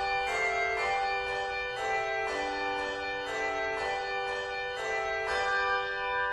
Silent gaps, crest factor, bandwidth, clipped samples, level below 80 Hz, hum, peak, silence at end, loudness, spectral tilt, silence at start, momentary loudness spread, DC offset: none; 14 dB; 12 kHz; under 0.1%; -56 dBFS; none; -18 dBFS; 0 s; -31 LUFS; -2.5 dB/octave; 0 s; 5 LU; under 0.1%